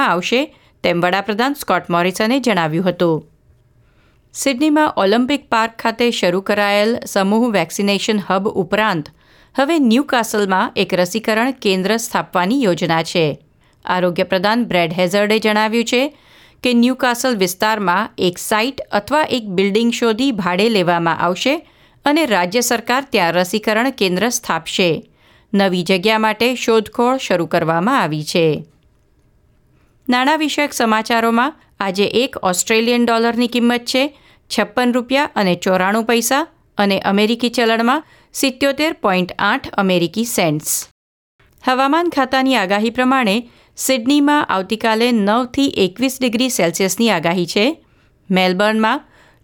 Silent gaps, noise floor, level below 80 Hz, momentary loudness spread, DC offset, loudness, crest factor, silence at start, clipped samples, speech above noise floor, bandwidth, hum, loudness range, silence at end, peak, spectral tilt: 40.91-41.39 s; -55 dBFS; -56 dBFS; 5 LU; under 0.1%; -16 LUFS; 16 dB; 0 s; under 0.1%; 39 dB; 19.5 kHz; none; 2 LU; 0.45 s; -2 dBFS; -4 dB/octave